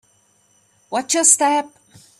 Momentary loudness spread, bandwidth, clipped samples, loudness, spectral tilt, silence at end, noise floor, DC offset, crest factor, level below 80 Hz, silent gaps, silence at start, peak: 14 LU; 15.5 kHz; under 0.1%; -16 LUFS; 0 dB/octave; 0.5 s; -59 dBFS; under 0.1%; 22 dB; -72 dBFS; none; 0.9 s; 0 dBFS